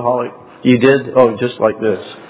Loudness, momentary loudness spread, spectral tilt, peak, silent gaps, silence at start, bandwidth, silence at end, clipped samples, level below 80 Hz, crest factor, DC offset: -14 LUFS; 8 LU; -11 dB/octave; 0 dBFS; none; 0 s; 4 kHz; 0.05 s; under 0.1%; -54 dBFS; 14 dB; under 0.1%